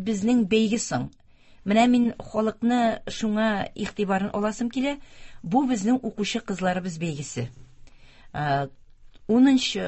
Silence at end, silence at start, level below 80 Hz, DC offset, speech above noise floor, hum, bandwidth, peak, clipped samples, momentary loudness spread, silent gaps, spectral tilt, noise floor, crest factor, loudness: 0 s; 0 s; -54 dBFS; under 0.1%; 24 dB; none; 8.4 kHz; -6 dBFS; under 0.1%; 14 LU; none; -5 dB/octave; -48 dBFS; 18 dB; -24 LUFS